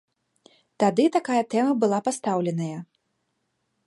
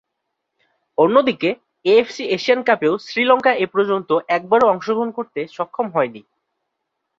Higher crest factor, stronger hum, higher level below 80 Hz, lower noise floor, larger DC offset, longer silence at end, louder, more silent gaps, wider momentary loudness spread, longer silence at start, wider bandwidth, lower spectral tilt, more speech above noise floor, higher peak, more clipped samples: about the same, 18 dB vs 18 dB; neither; second, -78 dBFS vs -64 dBFS; about the same, -75 dBFS vs -77 dBFS; neither; about the same, 1.05 s vs 1 s; second, -24 LUFS vs -18 LUFS; neither; about the same, 9 LU vs 10 LU; second, 0.8 s vs 1 s; first, 11.5 kHz vs 7.4 kHz; about the same, -6 dB/octave vs -5.5 dB/octave; second, 52 dB vs 59 dB; second, -8 dBFS vs -2 dBFS; neither